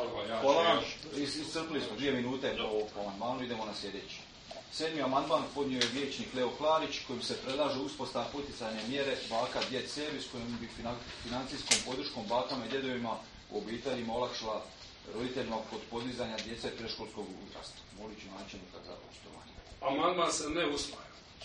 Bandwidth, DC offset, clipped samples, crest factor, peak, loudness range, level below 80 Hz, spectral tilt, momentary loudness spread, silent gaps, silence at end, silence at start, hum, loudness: 9.4 kHz; under 0.1%; under 0.1%; 28 dB; -8 dBFS; 7 LU; -60 dBFS; -3 dB/octave; 17 LU; none; 0 s; 0 s; none; -35 LUFS